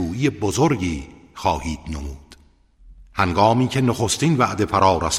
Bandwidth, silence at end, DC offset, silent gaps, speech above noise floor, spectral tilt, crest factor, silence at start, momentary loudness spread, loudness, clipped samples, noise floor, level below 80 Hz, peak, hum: 15.5 kHz; 0 s; under 0.1%; none; 33 dB; -5 dB/octave; 18 dB; 0 s; 15 LU; -20 LUFS; under 0.1%; -53 dBFS; -38 dBFS; -2 dBFS; none